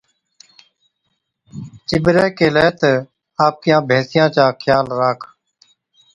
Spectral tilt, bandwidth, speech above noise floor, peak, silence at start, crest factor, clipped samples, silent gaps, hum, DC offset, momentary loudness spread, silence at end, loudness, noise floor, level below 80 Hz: -6.5 dB/octave; 11 kHz; 57 dB; 0 dBFS; 1.55 s; 18 dB; under 0.1%; none; none; under 0.1%; 16 LU; 0.9 s; -15 LUFS; -71 dBFS; -50 dBFS